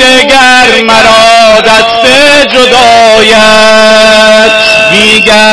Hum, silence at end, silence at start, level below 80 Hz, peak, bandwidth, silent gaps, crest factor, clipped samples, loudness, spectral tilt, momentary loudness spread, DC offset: none; 0 s; 0 s; -32 dBFS; 0 dBFS; 11 kHz; none; 2 dB; 40%; -1 LUFS; -2 dB/octave; 1 LU; 4%